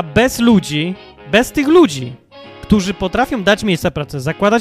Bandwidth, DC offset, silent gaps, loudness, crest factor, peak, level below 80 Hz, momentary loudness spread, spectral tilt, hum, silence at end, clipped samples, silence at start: 15.5 kHz; under 0.1%; none; -15 LUFS; 14 dB; 0 dBFS; -36 dBFS; 12 LU; -5.5 dB/octave; none; 0 s; under 0.1%; 0 s